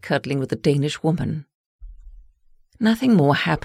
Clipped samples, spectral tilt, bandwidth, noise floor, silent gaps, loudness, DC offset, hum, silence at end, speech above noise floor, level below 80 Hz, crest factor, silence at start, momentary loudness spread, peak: under 0.1%; -6.5 dB/octave; 15.5 kHz; -54 dBFS; 1.54-1.79 s; -20 LUFS; under 0.1%; none; 0.05 s; 35 dB; -46 dBFS; 16 dB; 0.05 s; 8 LU; -6 dBFS